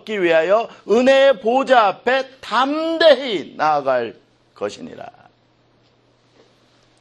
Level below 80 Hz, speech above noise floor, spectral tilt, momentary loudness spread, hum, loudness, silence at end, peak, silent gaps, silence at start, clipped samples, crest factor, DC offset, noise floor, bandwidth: -68 dBFS; 41 dB; -4 dB/octave; 15 LU; none; -17 LUFS; 1.9 s; 0 dBFS; none; 0.05 s; under 0.1%; 18 dB; under 0.1%; -58 dBFS; 9.2 kHz